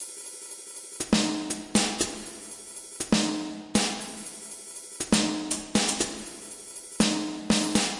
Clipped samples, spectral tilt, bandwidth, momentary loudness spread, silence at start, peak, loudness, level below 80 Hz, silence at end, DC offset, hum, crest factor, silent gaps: under 0.1%; -3 dB/octave; 11.5 kHz; 14 LU; 0 s; -8 dBFS; -27 LUFS; -54 dBFS; 0 s; under 0.1%; none; 20 dB; none